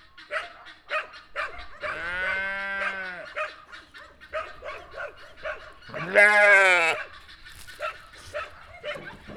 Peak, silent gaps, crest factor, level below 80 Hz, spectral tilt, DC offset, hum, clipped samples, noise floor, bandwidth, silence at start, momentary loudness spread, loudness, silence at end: -4 dBFS; none; 24 dB; -56 dBFS; -2.5 dB/octave; under 0.1%; none; under 0.1%; -48 dBFS; 15 kHz; 0.2 s; 24 LU; -23 LUFS; 0 s